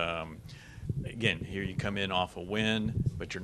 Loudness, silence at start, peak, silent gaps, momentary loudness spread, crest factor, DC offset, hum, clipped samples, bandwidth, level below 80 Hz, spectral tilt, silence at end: -32 LUFS; 0 s; -10 dBFS; none; 14 LU; 24 dB; under 0.1%; none; under 0.1%; 13 kHz; -50 dBFS; -5.5 dB/octave; 0 s